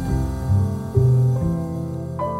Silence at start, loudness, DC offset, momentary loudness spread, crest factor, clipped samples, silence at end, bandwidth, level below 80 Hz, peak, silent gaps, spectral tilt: 0 s; -21 LUFS; under 0.1%; 10 LU; 14 dB; under 0.1%; 0 s; 12.5 kHz; -32 dBFS; -6 dBFS; none; -9.5 dB/octave